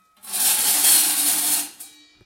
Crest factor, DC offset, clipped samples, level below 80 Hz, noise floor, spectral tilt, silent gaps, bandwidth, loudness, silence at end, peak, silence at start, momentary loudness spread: 18 dB; under 0.1%; under 0.1%; -68 dBFS; -45 dBFS; 2 dB/octave; none; 16.5 kHz; -16 LUFS; 0.4 s; -2 dBFS; 0.25 s; 11 LU